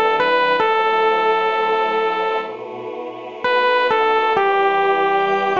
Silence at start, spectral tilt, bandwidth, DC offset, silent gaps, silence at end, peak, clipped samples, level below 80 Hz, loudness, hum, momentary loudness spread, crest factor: 0 s; -4.5 dB/octave; 7.4 kHz; 0.3%; none; 0 s; -4 dBFS; under 0.1%; -64 dBFS; -17 LUFS; none; 13 LU; 14 dB